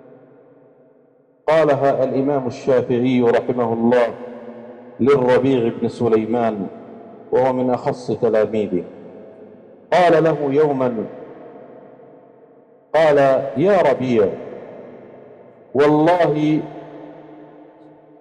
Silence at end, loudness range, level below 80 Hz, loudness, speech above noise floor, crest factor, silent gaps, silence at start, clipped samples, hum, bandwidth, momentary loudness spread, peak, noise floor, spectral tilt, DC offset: 0.75 s; 3 LU; -58 dBFS; -17 LUFS; 38 dB; 12 dB; none; 1.45 s; under 0.1%; none; 10 kHz; 23 LU; -8 dBFS; -54 dBFS; -7.5 dB/octave; under 0.1%